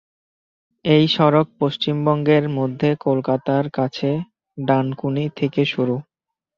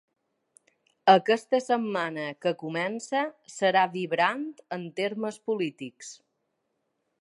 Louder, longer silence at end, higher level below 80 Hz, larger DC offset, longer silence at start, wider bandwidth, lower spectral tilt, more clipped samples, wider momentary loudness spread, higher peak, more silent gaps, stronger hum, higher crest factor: first, -20 LUFS vs -27 LUFS; second, 0.55 s vs 1.1 s; first, -60 dBFS vs -84 dBFS; neither; second, 0.85 s vs 1.05 s; second, 7 kHz vs 11.5 kHz; first, -8 dB/octave vs -4.5 dB/octave; neither; second, 8 LU vs 15 LU; first, -2 dBFS vs -6 dBFS; neither; neither; about the same, 18 dB vs 22 dB